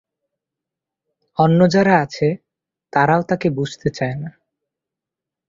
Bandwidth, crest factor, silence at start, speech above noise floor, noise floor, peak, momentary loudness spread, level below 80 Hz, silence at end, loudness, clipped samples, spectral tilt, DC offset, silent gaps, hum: 7.6 kHz; 18 dB; 1.4 s; 69 dB; -86 dBFS; -2 dBFS; 16 LU; -56 dBFS; 1.2 s; -17 LUFS; under 0.1%; -7 dB/octave; under 0.1%; none; none